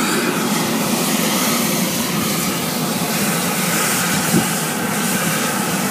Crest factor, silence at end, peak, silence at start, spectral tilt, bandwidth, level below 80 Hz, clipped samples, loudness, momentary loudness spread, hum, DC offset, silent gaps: 16 dB; 0 s; -2 dBFS; 0 s; -3 dB/octave; 15.5 kHz; -54 dBFS; under 0.1%; -17 LUFS; 3 LU; none; under 0.1%; none